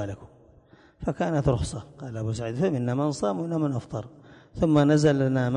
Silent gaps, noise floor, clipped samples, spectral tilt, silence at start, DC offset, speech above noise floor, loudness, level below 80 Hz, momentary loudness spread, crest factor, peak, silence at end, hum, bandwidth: none; -55 dBFS; under 0.1%; -7 dB/octave; 0 s; under 0.1%; 31 dB; -25 LUFS; -46 dBFS; 17 LU; 16 dB; -10 dBFS; 0 s; none; 10.5 kHz